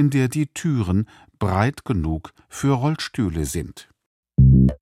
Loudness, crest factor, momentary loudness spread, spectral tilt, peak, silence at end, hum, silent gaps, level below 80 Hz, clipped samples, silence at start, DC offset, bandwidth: -21 LUFS; 16 dB; 14 LU; -7 dB/octave; -4 dBFS; 0.05 s; none; 4.06-4.23 s; -30 dBFS; under 0.1%; 0 s; under 0.1%; 15 kHz